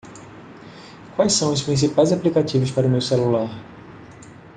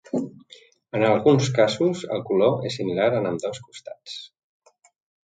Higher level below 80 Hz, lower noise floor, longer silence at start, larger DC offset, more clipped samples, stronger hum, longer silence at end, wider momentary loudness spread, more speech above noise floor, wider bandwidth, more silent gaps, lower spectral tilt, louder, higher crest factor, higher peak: first, -56 dBFS vs -64 dBFS; second, -42 dBFS vs -52 dBFS; about the same, 0.05 s vs 0.15 s; neither; neither; neither; second, 0.25 s vs 1 s; first, 23 LU vs 18 LU; second, 23 dB vs 30 dB; about the same, 9.6 kHz vs 9.2 kHz; neither; about the same, -5.5 dB/octave vs -6 dB/octave; about the same, -20 LUFS vs -22 LUFS; about the same, 18 dB vs 18 dB; about the same, -4 dBFS vs -4 dBFS